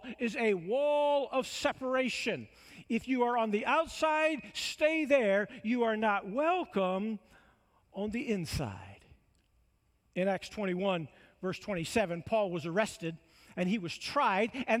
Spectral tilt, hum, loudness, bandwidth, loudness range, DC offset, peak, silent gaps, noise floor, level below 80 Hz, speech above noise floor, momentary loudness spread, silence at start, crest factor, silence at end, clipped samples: -5 dB/octave; none; -32 LUFS; 15.5 kHz; 8 LU; under 0.1%; -14 dBFS; none; -72 dBFS; -62 dBFS; 40 dB; 11 LU; 0 s; 18 dB; 0 s; under 0.1%